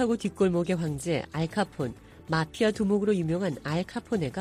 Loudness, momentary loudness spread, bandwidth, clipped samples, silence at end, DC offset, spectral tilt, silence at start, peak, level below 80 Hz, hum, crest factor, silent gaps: -28 LUFS; 6 LU; 14.5 kHz; under 0.1%; 0 s; under 0.1%; -6.5 dB/octave; 0 s; -12 dBFS; -54 dBFS; none; 14 dB; none